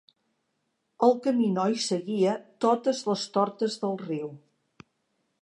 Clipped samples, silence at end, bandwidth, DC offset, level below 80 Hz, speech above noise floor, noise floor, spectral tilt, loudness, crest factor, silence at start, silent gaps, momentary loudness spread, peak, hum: under 0.1%; 1.05 s; 11 kHz; under 0.1%; -80 dBFS; 51 dB; -77 dBFS; -5.5 dB/octave; -27 LUFS; 20 dB; 1 s; none; 8 LU; -8 dBFS; none